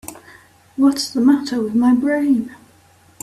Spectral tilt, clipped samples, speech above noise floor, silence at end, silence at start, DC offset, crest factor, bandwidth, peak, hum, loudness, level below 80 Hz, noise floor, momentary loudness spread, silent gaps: -4.5 dB/octave; under 0.1%; 35 dB; 0.65 s; 0.05 s; under 0.1%; 16 dB; 15 kHz; -4 dBFS; none; -17 LUFS; -58 dBFS; -51 dBFS; 17 LU; none